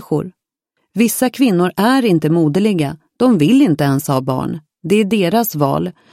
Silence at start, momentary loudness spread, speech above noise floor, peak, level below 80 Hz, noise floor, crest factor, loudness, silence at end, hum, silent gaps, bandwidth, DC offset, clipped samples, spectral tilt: 0 s; 9 LU; 56 dB; 0 dBFS; -54 dBFS; -70 dBFS; 14 dB; -15 LUFS; 0.2 s; none; none; 16.5 kHz; under 0.1%; under 0.1%; -6 dB/octave